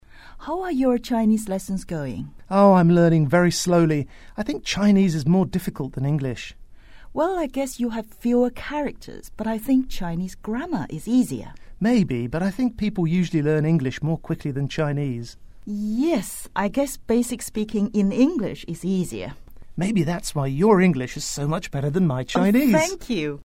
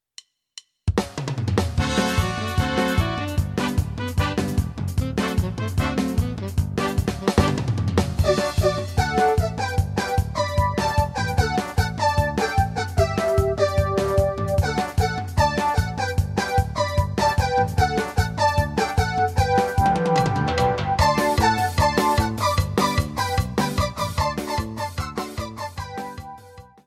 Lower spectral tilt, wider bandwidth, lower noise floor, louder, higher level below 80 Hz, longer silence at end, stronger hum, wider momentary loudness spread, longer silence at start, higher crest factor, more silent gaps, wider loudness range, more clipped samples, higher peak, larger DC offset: about the same, -6.5 dB/octave vs -5.5 dB/octave; about the same, 16 kHz vs 16 kHz; second, -42 dBFS vs -49 dBFS; about the same, -22 LUFS vs -22 LUFS; second, -42 dBFS vs -32 dBFS; about the same, 0.15 s vs 0.25 s; neither; first, 12 LU vs 6 LU; second, 0.15 s vs 0.85 s; about the same, 18 dB vs 18 dB; neither; about the same, 6 LU vs 4 LU; neither; about the same, -4 dBFS vs -4 dBFS; neither